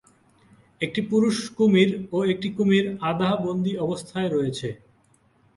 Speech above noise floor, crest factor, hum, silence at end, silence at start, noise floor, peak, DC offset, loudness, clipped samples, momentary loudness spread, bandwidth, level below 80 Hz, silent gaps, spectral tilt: 39 dB; 18 dB; none; 0.8 s; 0.8 s; -61 dBFS; -6 dBFS; under 0.1%; -23 LUFS; under 0.1%; 8 LU; 11.5 kHz; -62 dBFS; none; -6 dB/octave